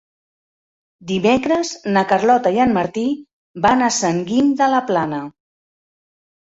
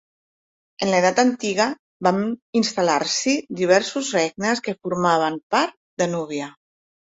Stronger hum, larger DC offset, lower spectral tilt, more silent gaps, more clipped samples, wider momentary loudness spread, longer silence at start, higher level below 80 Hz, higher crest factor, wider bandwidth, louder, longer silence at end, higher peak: neither; neither; about the same, -4.5 dB/octave vs -4 dB/octave; second, 3.33-3.54 s vs 1.79-2.00 s, 2.42-2.53 s, 5.43-5.50 s, 5.77-5.97 s; neither; about the same, 9 LU vs 8 LU; first, 1 s vs 0.8 s; first, -54 dBFS vs -66 dBFS; about the same, 16 dB vs 18 dB; about the same, 8.2 kHz vs 8 kHz; first, -17 LUFS vs -21 LUFS; first, 1.15 s vs 0.7 s; about the same, -2 dBFS vs -4 dBFS